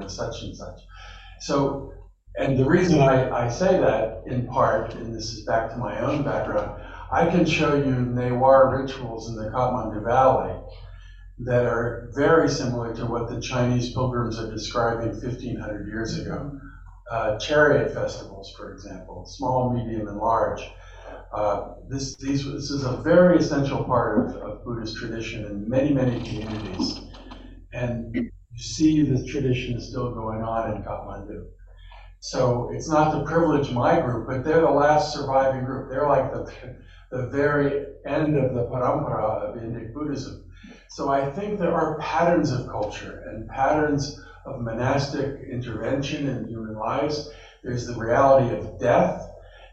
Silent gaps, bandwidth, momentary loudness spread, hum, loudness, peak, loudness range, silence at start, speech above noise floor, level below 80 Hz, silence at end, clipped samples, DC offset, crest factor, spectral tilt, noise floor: none; 8.2 kHz; 18 LU; none; -24 LUFS; -4 dBFS; 6 LU; 0 s; 22 dB; -42 dBFS; 0.05 s; under 0.1%; under 0.1%; 20 dB; -6.5 dB/octave; -45 dBFS